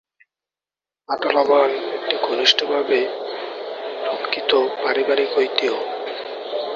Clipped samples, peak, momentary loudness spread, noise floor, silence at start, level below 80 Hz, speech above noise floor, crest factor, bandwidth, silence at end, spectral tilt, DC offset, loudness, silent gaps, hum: under 0.1%; 0 dBFS; 13 LU; under -90 dBFS; 1.1 s; -70 dBFS; over 71 dB; 20 dB; 7.4 kHz; 0 s; -2 dB/octave; under 0.1%; -20 LUFS; none; none